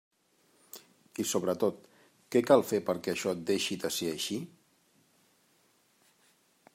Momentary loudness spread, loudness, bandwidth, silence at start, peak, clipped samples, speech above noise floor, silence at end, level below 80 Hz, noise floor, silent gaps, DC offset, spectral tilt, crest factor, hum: 25 LU; -30 LUFS; 16 kHz; 0.75 s; -10 dBFS; under 0.1%; 39 dB; 2.3 s; -78 dBFS; -69 dBFS; none; under 0.1%; -4 dB/octave; 24 dB; none